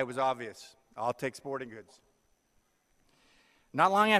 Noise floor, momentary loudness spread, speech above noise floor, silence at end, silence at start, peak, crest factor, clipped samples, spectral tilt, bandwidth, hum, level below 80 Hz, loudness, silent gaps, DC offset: -72 dBFS; 22 LU; 42 dB; 0 s; 0 s; -10 dBFS; 22 dB; under 0.1%; -4.5 dB/octave; 15 kHz; none; -74 dBFS; -32 LUFS; none; under 0.1%